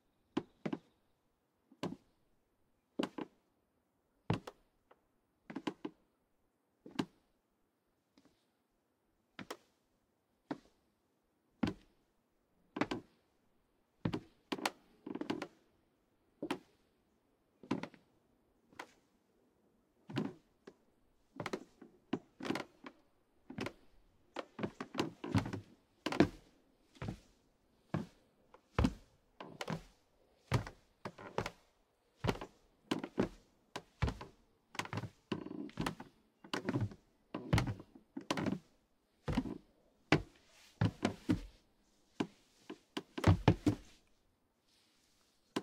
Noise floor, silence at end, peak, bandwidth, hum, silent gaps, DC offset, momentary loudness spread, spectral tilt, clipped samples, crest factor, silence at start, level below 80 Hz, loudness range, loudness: -80 dBFS; 0 s; -10 dBFS; 16 kHz; none; none; under 0.1%; 18 LU; -6 dB/octave; under 0.1%; 32 dB; 0.35 s; -58 dBFS; 12 LU; -41 LUFS